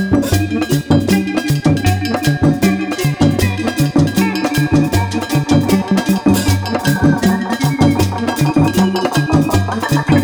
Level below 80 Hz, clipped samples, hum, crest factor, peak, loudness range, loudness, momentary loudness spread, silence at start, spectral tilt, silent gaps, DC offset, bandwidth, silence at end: -34 dBFS; under 0.1%; none; 12 dB; 0 dBFS; 1 LU; -14 LUFS; 3 LU; 0 s; -6 dB/octave; none; under 0.1%; over 20 kHz; 0 s